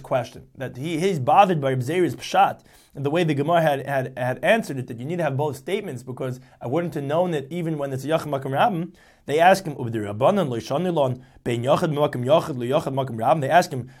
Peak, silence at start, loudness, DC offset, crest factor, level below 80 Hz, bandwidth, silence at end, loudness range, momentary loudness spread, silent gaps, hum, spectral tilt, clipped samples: -4 dBFS; 0 s; -22 LUFS; under 0.1%; 20 dB; -60 dBFS; 16 kHz; 0.1 s; 4 LU; 13 LU; none; none; -6 dB/octave; under 0.1%